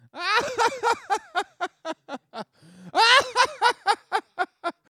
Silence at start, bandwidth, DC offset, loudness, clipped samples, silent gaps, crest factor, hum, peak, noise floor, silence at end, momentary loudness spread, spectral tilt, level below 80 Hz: 0.15 s; 15.5 kHz; under 0.1%; -23 LUFS; under 0.1%; none; 22 dB; none; -2 dBFS; -48 dBFS; 0.3 s; 20 LU; -0.5 dB/octave; -70 dBFS